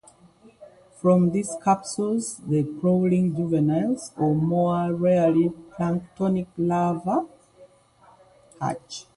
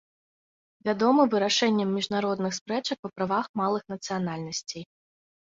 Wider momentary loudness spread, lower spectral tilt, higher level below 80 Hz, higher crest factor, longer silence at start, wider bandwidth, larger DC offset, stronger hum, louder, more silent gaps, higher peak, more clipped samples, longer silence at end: second, 8 LU vs 11 LU; first, -7.5 dB/octave vs -4.5 dB/octave; first, -60 dBFS vs -70 dBFS; about the same, 16 dB vs 20 dB; second, 0.6 s vs 0.85 s; first, 11.5 kHz vs 7.8 kHz; neither; neither; first, -24 LUFS vs -27 LUFS; second, none vs 2.61-2.66 s, 2.99-3.03 s, 3.49-3.54 s; about the same, -8 dBFS vs -8 dBFS; neither; second, 0.15 s vs 0.75 s